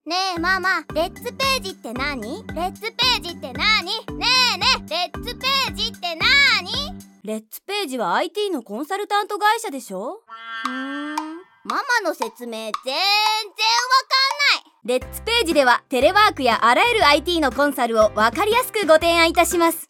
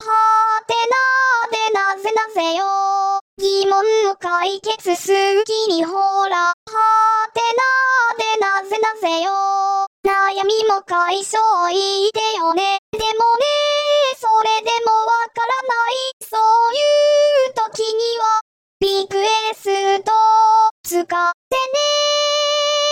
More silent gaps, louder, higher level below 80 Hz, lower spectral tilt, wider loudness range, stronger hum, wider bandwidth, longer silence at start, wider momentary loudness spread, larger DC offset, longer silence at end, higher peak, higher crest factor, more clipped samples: second, none vs 3.21-3.37 s, 6.53-6.66 s, 9.87-10.03 s, 12.79-12.93 s, 16.13-16.20 s, 18.41-18.80 s, 20.71-20.84 s, 21.34-21.51 s; second, -19 LUFS vs -16 LUFS; first, -44 dBFS vs -58 dBFS; first, -2.5 dB/octave vs -1 dB/octave; first, 8 LU vs 2 LU; neither; about the same, 18.5 kHz vs 17 kHz; about the same, 0.05 s vs 0 s; first, 14 LU vs 6 LU; neither; about the same, 0.05 s vs 0 s; first, -2 dBFS vs -6 dBFS; first, 18 dB vs 10 dB; neither